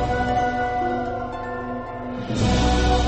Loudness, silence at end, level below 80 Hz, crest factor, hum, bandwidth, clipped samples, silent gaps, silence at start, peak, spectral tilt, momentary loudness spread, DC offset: -24 LUFS; 0 s; -28 dBFS; 14 dB; none; 8.6 kHz; under 0.1%; none; 0 s; -8 dBFS; -5.5 dB/octave; 11 LU; under 0.1%